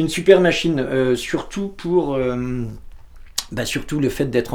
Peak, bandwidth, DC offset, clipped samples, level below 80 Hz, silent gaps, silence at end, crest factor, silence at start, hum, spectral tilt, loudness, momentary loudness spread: 0 dBFS; 18 kHz; under 0.1%; under 0.1%; -40 dBFS; none; 0 s; 20 dB; 0 s; none; -5 dB/octave; -20 LUFS; 14 LU